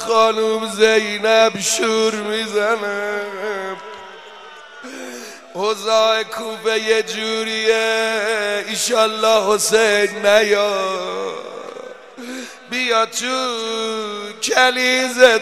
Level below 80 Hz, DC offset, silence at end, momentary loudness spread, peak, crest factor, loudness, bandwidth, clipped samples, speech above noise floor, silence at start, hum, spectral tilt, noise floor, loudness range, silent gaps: -66 dBFS; 0.2%; 0 s; 18 LU; 0 dBFS; 18 dB; -17 LUFS; 15.5 kHz; under 0.1%; 21 dB; 0 s; none; -1.5 dB/octave; -38 dBFS; 6 LU; none